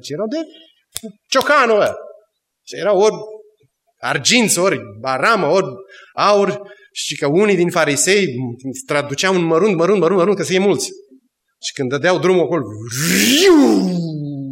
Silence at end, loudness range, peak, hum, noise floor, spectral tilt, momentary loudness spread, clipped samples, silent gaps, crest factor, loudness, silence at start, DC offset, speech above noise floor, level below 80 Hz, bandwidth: 0 s; 3 LU; 0 dBFS; none; -61 dBFS; -4 dB/octave; 16 LU; under 0.1%; none; 16 dB; -15 LUFS; 0.05 s; under 0.1%; 45 dB; -60 dBFS; 16.5 kHz